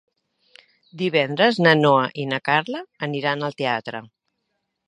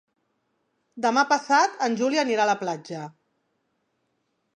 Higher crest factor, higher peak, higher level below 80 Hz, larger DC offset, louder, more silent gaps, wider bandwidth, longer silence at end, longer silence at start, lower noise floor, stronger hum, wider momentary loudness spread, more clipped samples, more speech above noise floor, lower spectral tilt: about the same, 22 dB vs 22 dB; first, 0 dBFS vs -6 dBFS; first, -72 dBFS vs -82 dBFS; neither; first, -20 LUFS vs -23 LUFS; neither; about the same, 10.5 kHz vs 9.8 kHz; second, 0.8 s vs 1.45 s; about the same, 0.95 s vs 0.95 s; about the same, -76 dBFS vs -74 dBFS; neither; about the same, 13 LU vs 15 LU; neither; first, 55 dB vs 51 dB; first, -6.5 dB/octave vs -3.5 dB/octave